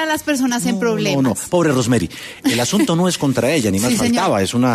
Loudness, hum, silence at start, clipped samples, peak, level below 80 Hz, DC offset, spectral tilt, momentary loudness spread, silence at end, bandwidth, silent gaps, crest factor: -17 LUFS; none; 0 s; under 0.1%; -4 dBFS; -48 dBFS; under 0.1%; -4.5 dB/octave; 3 LU; 0 s; 13.5 kHz; none; 12 dB